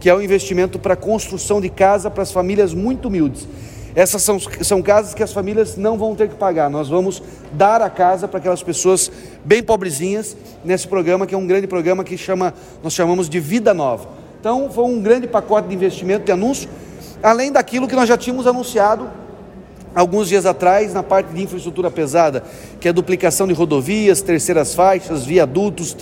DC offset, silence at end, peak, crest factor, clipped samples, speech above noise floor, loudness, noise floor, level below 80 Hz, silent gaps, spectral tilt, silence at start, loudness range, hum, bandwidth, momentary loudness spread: under 0.1%; 0 s; 0 dBFS; 16 dB; under 0.1%; 21 dB; -16 LUFS; -37 dBFS; -44 dBFS; none; -4.5 dB/octave; 0 s; 2 LU; none; 16.5 kHz; 9 LU